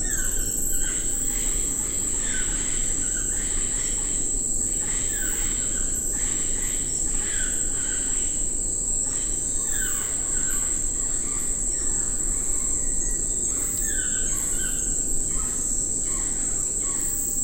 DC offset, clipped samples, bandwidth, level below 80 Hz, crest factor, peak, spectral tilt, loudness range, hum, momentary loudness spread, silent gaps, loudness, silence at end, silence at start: under 0.1%; under 0.1%; 16 kHz; -32 dBFS; 14 dB; -10 dBFS; -1.5 dB/octave; 0 LU; none; 1 LU; none; -23 LUFS; 0 s; 0 s